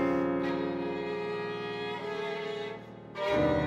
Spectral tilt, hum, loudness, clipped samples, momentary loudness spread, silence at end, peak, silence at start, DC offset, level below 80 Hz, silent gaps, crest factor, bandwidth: -7 dB/octave; none; -33 LUFS; under 0.1%; 9 LU; 0 s; -16 dBFS; 0 s; under 0.1%; -56 dBFS; none; 16 dB; 9.6 kHz